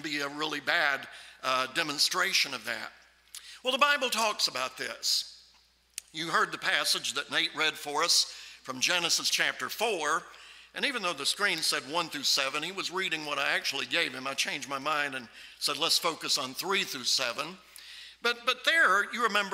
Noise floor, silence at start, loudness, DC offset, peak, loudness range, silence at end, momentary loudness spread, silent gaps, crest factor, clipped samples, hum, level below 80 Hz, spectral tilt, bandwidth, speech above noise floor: -64 dBFS; 0 s; -28 LUFS; under 0.1%; -8 dBFS; 2 LU; 0 s; 15 LU; none; 22 dB; under 0.1%; none; -74 dBFS; -0.5 dB/octave; 16 kHz; 34 dB